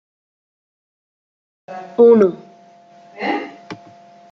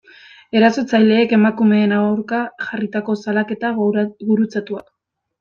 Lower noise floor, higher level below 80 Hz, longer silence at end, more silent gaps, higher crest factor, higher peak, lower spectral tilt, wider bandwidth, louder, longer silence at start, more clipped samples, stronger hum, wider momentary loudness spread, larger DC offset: about the same, -47 dBFS vs -45 dBFS; second, -70 dBFS vs -64 dBFS; about the same, 0.55 s vs 0.6 s; neither; about the same, 18 dB vs 14 dB; about the same, -2 dBFS vs -2 dBFS; about the same, -7.5 dB/octave vs -7 dB/octave; second, 6.2 kHz vs 7 kHz; about the same, -15 LUFS vs -17 LUFS; first, 1.7 s vs 0.55 s; neither; neither; first, 26 LU vs 10 LU; neither